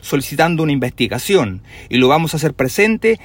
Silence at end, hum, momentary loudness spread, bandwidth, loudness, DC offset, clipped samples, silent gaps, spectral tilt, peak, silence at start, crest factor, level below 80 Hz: 0 s; none; 6 LU; 16.5 kHz; -16 LUFS; under 0.1%; under 0.1%; none; -5 dB/octave; 0 dBFS; 0.05 s; 16 dB; -44 dBFS